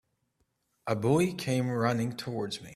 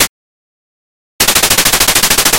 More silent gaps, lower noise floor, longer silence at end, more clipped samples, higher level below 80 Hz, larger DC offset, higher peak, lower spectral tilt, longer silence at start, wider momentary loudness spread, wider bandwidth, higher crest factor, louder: second, none vs 0.09-1.19 s; second, -76 dBFS vs under -90 dBFS; about the same, 0 s vs 0 s; second, under 0.1% vs 0.4%; second, -64 dBFS vs -32 dBFS; neither; second, -12 dBFS vs 0 dBFS; first, -6 dB/octave vs -0.5 dB/octave; first, 0.85 s vs 0 s; first, 9 LU vs 5 LU; second, 14.5 kHz vs over 20 kHz; first, 18 dB vs 12 dB; second, -30 LUFS vs -8 LUFS